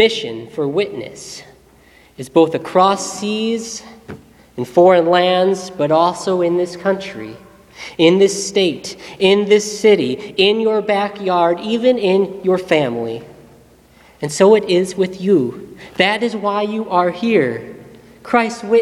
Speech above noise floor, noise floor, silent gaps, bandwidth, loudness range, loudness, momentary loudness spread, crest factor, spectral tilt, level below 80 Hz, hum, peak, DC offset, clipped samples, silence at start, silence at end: 32 dB; -48 dBFS; none; 13.5 kHz; 4 LU; -16 LUFS; 18 LU; 16 dB; -4.5 dB/octave; -56 dBFS; none; 0 dBFS; under 0.1%; under 0.1%; 0 s; 0 s